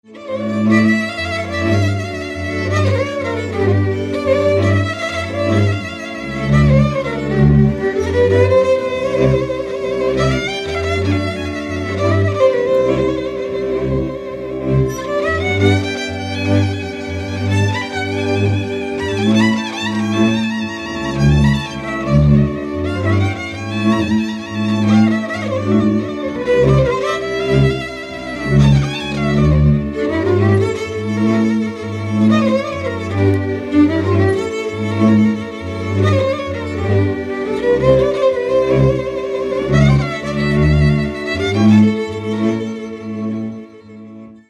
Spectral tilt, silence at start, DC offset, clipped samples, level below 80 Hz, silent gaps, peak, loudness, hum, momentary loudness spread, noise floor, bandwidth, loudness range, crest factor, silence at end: -7 dB/octave; 0.1 s; under 0.1%; under 0.1%; -30 dBFS; none; 0 dBFS; -16 LUFS; none; 10 LU; -36 dBFS; 10.5 kHz; 3 LU; 16 dB; 0.15 s